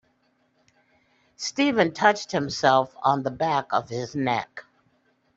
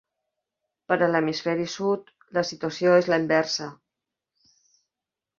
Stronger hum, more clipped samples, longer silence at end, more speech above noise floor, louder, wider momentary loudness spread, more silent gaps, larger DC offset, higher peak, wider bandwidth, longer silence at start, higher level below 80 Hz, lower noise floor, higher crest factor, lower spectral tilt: neither; neither; second, 0.75 s vs 1.65 s; second, 44 dB vs 65 dB; about the same, -24 LUFS vs -24 LUFS; about the same, 11 LU vs 10 LU; neither; neither; first, -2 dBFS vs -6 dBFS; about the same, 8 kHz vs 7.4 kHz; first, 1.4 s vs 0.9 s; first, -64 dBFS vs -70 dBFS; second, -67 dBFS vs -88 dBFS; about the same, 22 dB vs 20 dB; about the same, -4.5 dB/octave vs -5 dB/octave